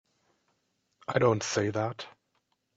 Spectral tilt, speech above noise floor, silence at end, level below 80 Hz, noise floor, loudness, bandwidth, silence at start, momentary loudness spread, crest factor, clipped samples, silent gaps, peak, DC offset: -5 dB/octave; 48 dB; 0.65 s; -68 dBFS; -76 dBFS; -29 LUFS; 8 kHz; 1.1 s; 17 LU; 22 dB; under 0.1%; none; -10 dBFS; under 0.1%